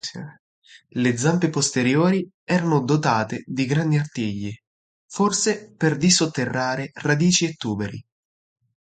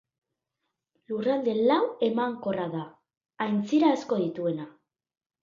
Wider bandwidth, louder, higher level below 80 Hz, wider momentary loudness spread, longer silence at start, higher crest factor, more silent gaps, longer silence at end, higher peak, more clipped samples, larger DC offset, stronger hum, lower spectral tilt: first, 9.4 kHz vs 7.4 kHz; first, -21 LUFS vs -27 LUFS; first, -58 dBFS vs -74 dBFS; about the same, 14 LU vs 13 LU; second, 0.05 s vs 1.1 s; about the same, 18 dB vs 18 dB; first, 0.39-0.62 s, 2.34-2.47 s, 4.67-5.09 s vs 3.17-3.21 s; about the same, 0.8 s vs 0.75 s; first, -4 dBFS vs -12 dBFS; neither; neither; neither; second, -4.5 dB/octave vs -7 dB/octave